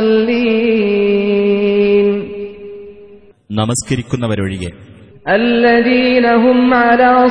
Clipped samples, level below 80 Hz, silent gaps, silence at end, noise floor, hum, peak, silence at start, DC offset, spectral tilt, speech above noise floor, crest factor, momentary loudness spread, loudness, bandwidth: under 0.1%; -44 dBFS; none; 0 s; -40 dBFS; none; 0 dBFS; 0 s; 0.4%; -5.5 dB/octave; 29 dB; 12 dB; 16 LU; -12 LUFS; 11 kHz